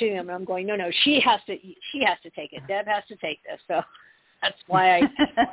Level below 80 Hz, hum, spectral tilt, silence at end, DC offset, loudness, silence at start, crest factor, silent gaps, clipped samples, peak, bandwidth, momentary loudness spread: -60 dBFS; none; -8 dB/octave; 0 s; under 0.1%; -23 LUFS; 0 s; 18 dB; none; under 0.1%; -8 dBFS; 4 kHz; 16 LU